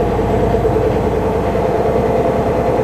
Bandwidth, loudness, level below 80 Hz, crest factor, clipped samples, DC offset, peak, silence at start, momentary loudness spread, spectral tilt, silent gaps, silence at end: 14 kHz; -15 LUFS; -26 dBFS; 12 dB; under 0.1%; under 0.1%; -2 dBFS; 0 s; 2 LU; -8 dB/octave; none; 0 s